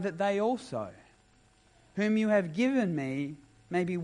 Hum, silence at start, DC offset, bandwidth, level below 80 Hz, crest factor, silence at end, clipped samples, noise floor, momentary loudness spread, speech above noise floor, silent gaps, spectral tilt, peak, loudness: none; 0 s; under 0.1%; 11 kHz; -68 dBFS; 16 dB; 0 s; under 0.1%; -64 dBFS; 13 LU; 34 dB; none; -7 dB/octave; -16 dBFS; -30 LUFS